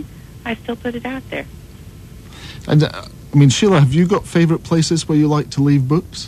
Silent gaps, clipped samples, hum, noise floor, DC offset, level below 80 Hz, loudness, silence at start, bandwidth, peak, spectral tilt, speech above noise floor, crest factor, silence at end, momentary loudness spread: none; under 0.1%; none; -37 dBFS; under 0.1%; -42 dBFS; -16 LUFS; 0 s; 13 kHz; 0 dBFS; -6 dB/octave; 22 dB; 16 dB; 0 s; 18 LU